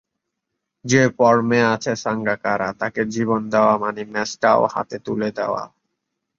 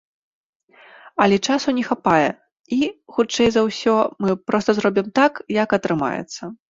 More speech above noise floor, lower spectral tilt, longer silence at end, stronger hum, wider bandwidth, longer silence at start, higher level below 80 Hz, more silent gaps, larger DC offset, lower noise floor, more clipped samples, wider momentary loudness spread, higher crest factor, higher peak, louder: first, 60 dB vs 29 dB; about the same, -5 dB/octave vs -5 dB/octave; first, 0.7 s vs 0.15 s; neither; about the same, 7.6 kHz vs 7.8 kHz; second, 0.85 s vs 1.05 s; about the same, -58 dBFS vs -56 dBFS; second, none vs 2.60-2.64 s; neither; first, -79 dBFS vs -48 dBFS; neither; first, 10 LU vs 7 LU; about the same, 18 dB vs 18 dB; about the same, -2 dBFS vs -2 dBFS; about the same, -20 LUFS vs -20 LUFS